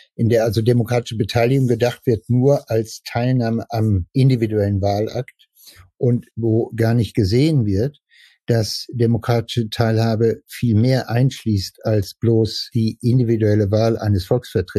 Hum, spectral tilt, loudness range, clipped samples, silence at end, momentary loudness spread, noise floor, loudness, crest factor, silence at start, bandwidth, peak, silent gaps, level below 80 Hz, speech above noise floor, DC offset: none; -7 dB/octave; 2 LU; under 0.1%; 0 s; 6 LU; -47 dBFS; -19 LUFS; 14 dB; 0.2 s; 13.5 kHz; -4 dBFS; none; -48 dBFS; 30 dB; under 0.1%